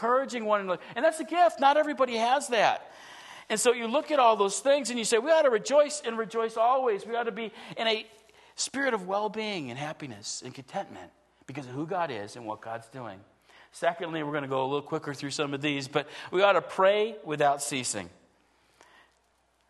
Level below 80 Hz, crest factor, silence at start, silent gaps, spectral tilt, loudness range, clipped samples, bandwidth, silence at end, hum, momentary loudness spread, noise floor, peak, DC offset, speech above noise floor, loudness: -76 dBFS; 20 dB; 0 s; none; -3 dB/octave; 11 LU; under 0.1%; 12.5 kHz; 1.6 s; none; 15 LU; -69 dBFS; -8 dBFS; under 0.1%; 42 dB; -28 LUFS